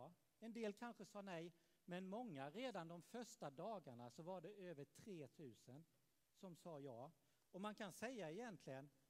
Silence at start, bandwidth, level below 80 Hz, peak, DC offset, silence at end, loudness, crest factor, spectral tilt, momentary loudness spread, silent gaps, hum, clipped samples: 0 s; 15.5 kHz; under -90 dBFS; -38 dBFS; under 0.1%; 0.2 s; -56 LUFS; 18 dB; -5.5 dB/octave; 11 LU; none; none; under 0.1%